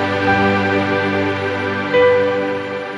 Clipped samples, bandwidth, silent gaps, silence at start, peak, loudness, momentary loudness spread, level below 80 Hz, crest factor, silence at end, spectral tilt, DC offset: under 0.1%; 10 kHz; none; 0 s; -2 dBFS; -16 LUFS; 7 LU; -52 dBFS; 14 dB; 0 s; -6.5 dB/octave; under 0.1%